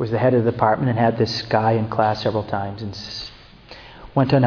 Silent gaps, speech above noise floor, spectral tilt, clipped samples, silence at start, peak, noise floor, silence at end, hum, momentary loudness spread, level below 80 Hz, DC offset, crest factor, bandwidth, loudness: none; 24 dB; -7.5 dB/octave; under 0.1%; 0 s; -2 dBFS; -43 dBFS; 0 s; none; 14 LU; -48 dBFS; under 0.1%; 18 dB; 5.4 kHz; -21 LUFS